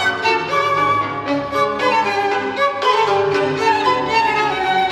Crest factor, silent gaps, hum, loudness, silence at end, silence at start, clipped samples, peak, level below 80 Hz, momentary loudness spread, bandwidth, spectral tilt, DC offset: 14 dB; none; none; -17 LUFS; 0 s; 0 s; under 0.1%; -2 dBFS; -52 dBFS; 4 LU; 13 kHz; -4 dB/octave; under 0.1%